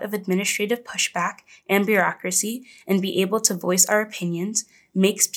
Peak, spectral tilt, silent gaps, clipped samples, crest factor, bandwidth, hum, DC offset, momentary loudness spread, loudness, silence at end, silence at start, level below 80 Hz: -2 dBFS; -3 dB/octave; none; under 0.1%; 22 dB; 19.5 kHz; none; under 0.1%; 9 LU; -22 LUFS; 0 s; 0 s; -80 dBFS